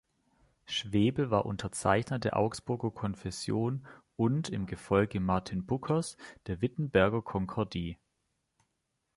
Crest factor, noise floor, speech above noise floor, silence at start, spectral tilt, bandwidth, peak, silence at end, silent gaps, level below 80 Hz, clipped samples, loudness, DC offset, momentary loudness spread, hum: 22 dB; -82 dBFS; 50 dB; 0.7 s; -6 dB/octave; 11.5 kHz; -10 dBFS; 1.2 s; none; -54 dBFS; under 0.1%; -32 LUFS; under 0.1%; 10 LU; none